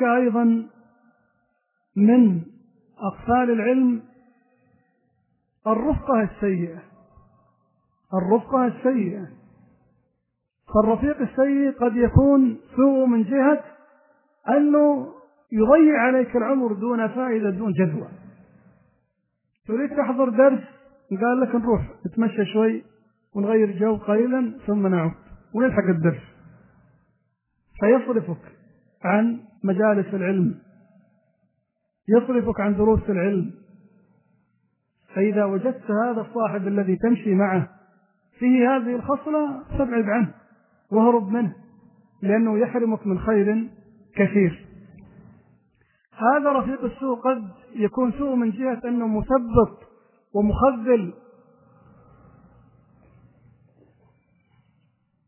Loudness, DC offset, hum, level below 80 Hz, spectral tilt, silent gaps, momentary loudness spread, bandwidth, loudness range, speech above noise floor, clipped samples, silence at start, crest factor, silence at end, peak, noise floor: -21 LUFS; under 0.1%; none; -46 dBFS; -12 dB/octave; none; 11 LU; 3.2 kHz; 6 LU; 55 dB; under 0.1%; 0 s; 20 dB; 4.15 s; -2 dBFS; -76 dBFS